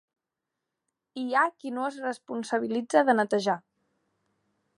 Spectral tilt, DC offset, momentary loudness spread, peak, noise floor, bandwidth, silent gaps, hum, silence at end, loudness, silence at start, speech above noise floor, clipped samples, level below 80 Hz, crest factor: -4.5 dB/octave; under 0.1%; 12 LU; -8 dBFS; -86 dBFS; 11.5 kHz; none; none; 1.2 s; -27 LUFS; 1.15 s; 59 dB; under 0.1%; -84 dBFS; 22 dB